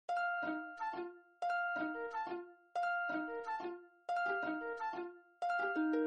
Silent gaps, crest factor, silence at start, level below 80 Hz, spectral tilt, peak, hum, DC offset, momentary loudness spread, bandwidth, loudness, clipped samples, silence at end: none; 14 dB; 0.1 s; -84 dBFS; -5 dB/octave; -26 dBFS; none; under 0.1%; 10 LU; 9 kHz; -40 LUFS; under 0.1%; 0 s